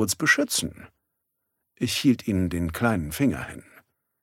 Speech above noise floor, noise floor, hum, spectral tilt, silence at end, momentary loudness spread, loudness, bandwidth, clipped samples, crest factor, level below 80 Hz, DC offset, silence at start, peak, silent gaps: 54 dB; -79 dBFS; none; -4 dB/octave; 0.6 s; 14 LU; -24 LUFS; 17 kHz; under 0.1%; 20 dB; -48 dBFS; under 0.1%; 0 s; -6 dBFS; none